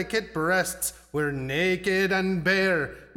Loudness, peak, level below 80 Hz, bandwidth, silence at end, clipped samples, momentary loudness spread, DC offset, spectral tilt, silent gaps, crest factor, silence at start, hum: -25 LUFS; -12 dBFS; -52 dBFS; 18 kHz; 0.1 s; under 0.1%; 6 LU; under 0.1%; -4 dB/octave; none; 14 dB; 0 s; none